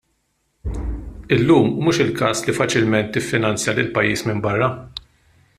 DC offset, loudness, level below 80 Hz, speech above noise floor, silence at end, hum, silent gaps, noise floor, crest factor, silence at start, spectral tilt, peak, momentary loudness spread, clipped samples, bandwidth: under 0.1%; -19 LUFS; -36 dBFS; 50 dB; 0.6 s; none; none; -68 dBFS; 18 dB; 0.65 s; -5 dB/octave; -2 dBFS; 17 LU; under 0.1%; 14.5 kHz